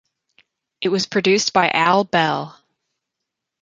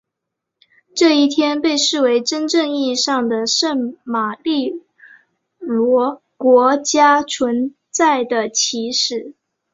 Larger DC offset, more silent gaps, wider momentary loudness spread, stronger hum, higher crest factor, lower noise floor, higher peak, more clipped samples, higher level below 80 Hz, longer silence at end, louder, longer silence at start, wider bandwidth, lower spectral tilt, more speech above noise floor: neither; neither; about the same, 10 LU vs 10 LU; neither; about the same, 20 dB vs 16 dB; about the same, -81 dBFS vs -80 dBFS; about the same, -2 dBFS vs -2 dBFS; neither; about the same, -66 dBFS vs -64 dBFS; first, 1.1 s vs 0.45 s; about the same, -18 LUFS vs -16 LUFS; second, 0.8 s vs 0.95 s; first, 9.2 kHz vs 7.8 kHz; first, -3.5 dB/octave vs -2 dB/octave; about the same, 64 dB vs 64 dB